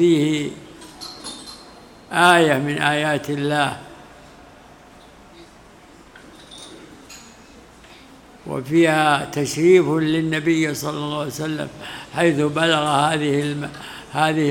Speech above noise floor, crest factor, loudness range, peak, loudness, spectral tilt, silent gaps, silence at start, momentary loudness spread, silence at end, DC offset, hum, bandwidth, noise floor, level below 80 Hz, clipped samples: 27 dB; 20 dB; 8 LU; 0 dBFS; -19 LUFS; -5 dB/octave; none; 0 s; 24 LU; 0 s; under 0.1%; none; 17.5 kHz; -46 dBFS; -56 dBFS; under 0.1%